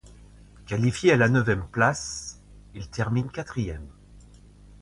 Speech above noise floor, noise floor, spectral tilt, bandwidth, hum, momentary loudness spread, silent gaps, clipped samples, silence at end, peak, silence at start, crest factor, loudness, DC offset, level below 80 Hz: 26 dB; -50 dBFS; -5.5 dB/octave; 11.5 kHz; none; 19 LU; none; under 0.1%; 0.6 s; -6 dBFS; 0.05 s; 20 dB; -25 LUFS; under 0.1%; -46 dBFS